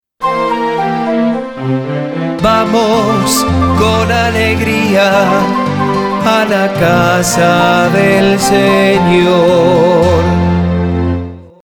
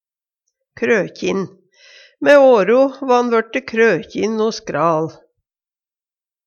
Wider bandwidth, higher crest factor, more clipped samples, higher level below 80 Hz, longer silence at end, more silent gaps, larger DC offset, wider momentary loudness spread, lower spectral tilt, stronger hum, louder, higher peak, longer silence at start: first, 20 kHz vs 7.6 kHz; second, 10 dB vs 18 dB; neither; first, -32 dBFS vs -62 dBFS; second, 0.2 s vs 1.35 s; neither; first, 0.2% vs under 0.1%; second, 7 LU vs 11 LU; about the same, -5.5 dB/octave vs -5.5 dB/octave; neither; first, -11 LUFS vs -16 LUFS; about the same, 0 dBFS vs 0 dBFS; second, 0.2 s vs 0.8 s